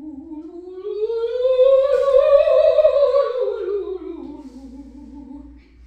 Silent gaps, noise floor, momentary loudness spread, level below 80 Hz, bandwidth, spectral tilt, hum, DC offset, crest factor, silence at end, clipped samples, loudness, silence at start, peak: none; -42 dBFS; 23 LU; -50 dBFS; 5.4 kHz; -6 dB/octave; none; under 0.1%; 16 dB; 0.35 s; under 0.1%; -17 LUFS; 0 s; -2 dBFS